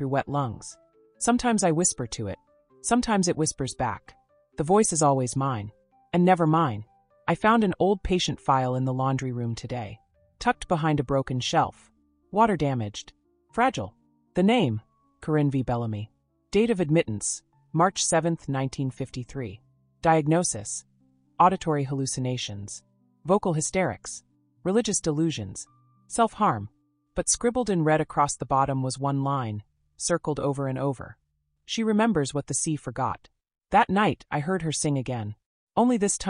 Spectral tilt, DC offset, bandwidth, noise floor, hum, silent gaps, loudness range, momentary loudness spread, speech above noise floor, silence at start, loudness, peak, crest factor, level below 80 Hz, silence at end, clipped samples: -5 dB/octave; under 0.1%; 11.5 kHz; -49 dBFS; none; 35.46-35.67 s; 3 LU; 14 LU; 24 dB; 0 s; -26 LUFS; -6 dBFS; 20 dB; -52 dBFS; 0 s; under 0.1%